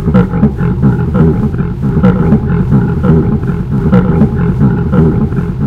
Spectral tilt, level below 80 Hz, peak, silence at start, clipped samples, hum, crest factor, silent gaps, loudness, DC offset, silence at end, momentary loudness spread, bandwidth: -11 dB/octave; -20 dBFS; 0 dBFS; 0 s; 0.6%; none; 10 dB; none; -10 LUFS; 0.5%; 0 s; 4 LU; 5 kHz